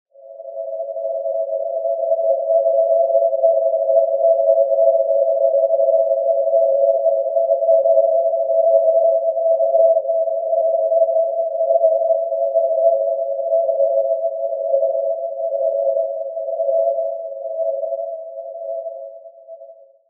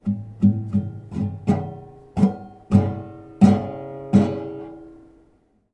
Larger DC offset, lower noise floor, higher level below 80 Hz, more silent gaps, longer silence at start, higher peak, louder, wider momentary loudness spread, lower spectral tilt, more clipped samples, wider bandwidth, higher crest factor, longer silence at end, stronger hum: neither; second, -43 dBFS vs -60 dBFS; second, -86 dBFS vs -54 dBFS; neither; first, 0.25 s vs 0.05 s; second, -4 dBFS vs 0 dBFS; first, -18 LUFS vs -22 LUFS; second, 11 LU vs 20 LU; second, -7 dB/octave vs -9.5 dB/octave; neither; second, 1 kHz vs 8.6 kHz; second, 14 dB vs 22 dB; second, 0.35 s vs 0.75 s; neither